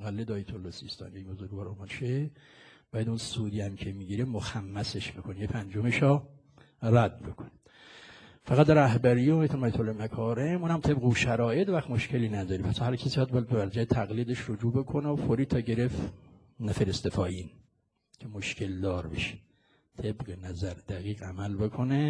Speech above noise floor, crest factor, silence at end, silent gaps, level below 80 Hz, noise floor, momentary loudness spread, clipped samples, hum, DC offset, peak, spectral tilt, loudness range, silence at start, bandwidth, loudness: 43 dB; 24 dB; 0 s; none; -52 dBFS; -72 dBFS; 15 LU; under 0.1%; none; under 0.1%; -6 dBFS; -7 dB/octave; 10 LU; 0 s; 10.5 kHz; -30 LUFS